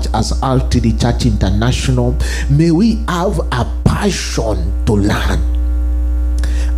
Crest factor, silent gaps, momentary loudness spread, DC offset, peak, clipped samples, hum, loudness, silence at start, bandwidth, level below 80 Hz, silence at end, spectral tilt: 12 dB; none; 4 LU; under 0.1%; 0 dBFS; under 0.1%; none; -15 LUFS; 0 s; 13.5 kHz; -16 dBFS; 0 s; -6 dB/octave